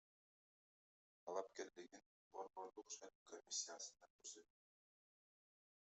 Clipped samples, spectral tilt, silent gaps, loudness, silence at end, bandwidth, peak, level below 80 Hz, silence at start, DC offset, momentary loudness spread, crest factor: under 0.1%; 0 dB/octave; 2.06-2.31 s, 3.15-3.26 s, 4.10-4.19 s; -53 LUFS; 1.45 s; 8.2 kHz; -34 dBFS; under -90 dBFS; 1.25 s; under 0.1%; 14 LU; 24 dB